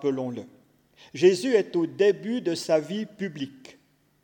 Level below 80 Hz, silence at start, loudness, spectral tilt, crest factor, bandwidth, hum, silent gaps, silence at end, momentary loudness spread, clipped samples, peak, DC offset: -78 dBFS; 0 s; -25 LUFS; -5.5 dB/octave; 18 dB; 18 kHz; none; none; 0.55 s; 16 LU; under 0.1%; -8 dBFS; under 0.1%